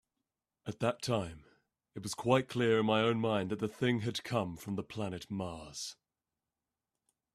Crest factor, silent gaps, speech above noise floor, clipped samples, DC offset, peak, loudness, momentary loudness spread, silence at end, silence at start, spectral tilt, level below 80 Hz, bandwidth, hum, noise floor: 22 dB; none; over 56 dB; under 0.1%; under 0.1%; -12 dBFS; -34 LUFS; 14 LU; 1.4 s; 0.65 s; -5.5 dB/octave; -68 dBFS; 14.5 kHz; none; under -90 dBFS